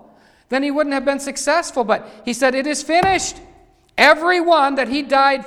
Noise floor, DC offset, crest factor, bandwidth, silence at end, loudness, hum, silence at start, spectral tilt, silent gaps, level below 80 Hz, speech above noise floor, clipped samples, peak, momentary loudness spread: -50 dBFS; under 0.1%; 18 dB; 16 kHz; 0 s; -17 LUFS; none; 0.5 s; -2.5 dB/octave; none; -50 dBFS; 33 dB; under 0.1%; 0 dBFS; 9 LU